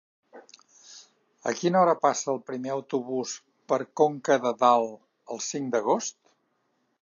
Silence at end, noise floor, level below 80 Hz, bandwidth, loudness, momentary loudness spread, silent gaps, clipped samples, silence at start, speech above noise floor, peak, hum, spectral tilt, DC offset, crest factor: 0.9 s; -73 dBFS; -82 dBFS; 7.6 kHz; -26 LUFS; 13 LU; none; under 0.1%; 0.35 s; 48 dB; -6 dBFS; none; -4 dB/octave; under 0.1%; 22 dB